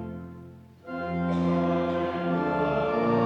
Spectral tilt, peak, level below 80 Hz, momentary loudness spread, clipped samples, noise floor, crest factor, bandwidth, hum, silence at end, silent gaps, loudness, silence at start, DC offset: -9 dB/octave; -14 dBFS; -54 dBFS; 17 LU; under 0.1%; -47 dBFS; 14 dB; 6.6 kHz; none; 0 s; none; -27 LUFS; 0 s; under 0.1%